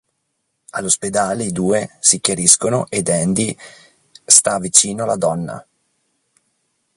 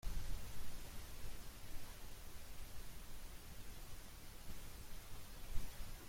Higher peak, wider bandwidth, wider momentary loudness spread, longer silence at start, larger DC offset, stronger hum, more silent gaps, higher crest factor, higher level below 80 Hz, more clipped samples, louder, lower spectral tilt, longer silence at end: first, 0 dBFS vs -26 dBFS; about the same, 16 kHz vs 16.5 kHz; first, 15 LU vs 4 LU; first, 0.75 s vs 0.05 s; neither; neither; neither; about the same, 18 dB vs 18 dB; about the same, -54 dBFS vs -50 dBFS; neither; first, -15 LUFS vs -55 LUFS; about the same, -2.5 dB/octave vs -3.5 dB/octave; first, 1.35 s vs 0 s